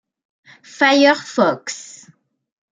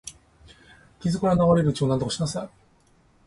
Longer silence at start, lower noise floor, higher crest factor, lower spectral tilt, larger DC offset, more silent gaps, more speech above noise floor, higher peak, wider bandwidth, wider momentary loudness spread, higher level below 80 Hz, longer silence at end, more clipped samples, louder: first, 0.8 s vs 0.05 s; second, -53 dBFS vs -60 dBFS; about the same, 18 dB vs 18 dB; second, -3 dB/octave vs -6.5 dB/octave; neither; neither; about the same, 36 dB vs 38 dB; first, -2 dBFS vs -6 dBFS; second, 9.4 kHz vs 11.5 kHz; first, 19 LU vs 16 LU; second, -72 dBFS vs -50 dBFS; first, 0.95 s vs 0.8 s; neither; first, -15 LUFS vs -23 LUFS